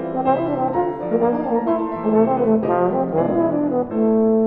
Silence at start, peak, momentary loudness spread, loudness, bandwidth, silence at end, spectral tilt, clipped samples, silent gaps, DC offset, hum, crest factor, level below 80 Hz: 0 s; -4 dBFS; 4 LU; -19 LUFS; 4 kHz; 0 s; -11.5 dB/octave; under 0.1%; none; under 0.1%; none; 14 dB; -54 dBFS